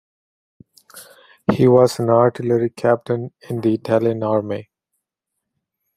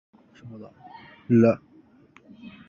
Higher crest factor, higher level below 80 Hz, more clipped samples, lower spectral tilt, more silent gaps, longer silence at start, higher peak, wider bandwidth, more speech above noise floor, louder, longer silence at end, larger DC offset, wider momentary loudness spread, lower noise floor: about the same, 18 dB vs 20 dB; first, -58 dBFS vs -64 dBFS; neither; second, -7.5 dB/octave vs -9.5 dB/octave; neither; first, 0.95 s vs 0.45 s; first, -2 dBFS vs -6 dBFS; first, 15 kHz vs 6.8 kHz; first, 63 dB vs 32 dB; first, -18 LUFS vs -21 LUFS; first, 1.35 s vs 0.2 s; neither; second, 11 LU vs 27 LU; first, -80 dBFS vs -55 dBFS